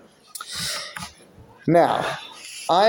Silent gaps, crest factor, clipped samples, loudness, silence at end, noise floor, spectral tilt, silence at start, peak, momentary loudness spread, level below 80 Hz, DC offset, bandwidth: none; 18 dB; under 0.1%; -23 LUFS; 0 s; -49 dBFS; -4 dB/octave; 0.35 s; -4 dBFS; 18 LU; -58 dBFS; under 0.1%; 17 kHz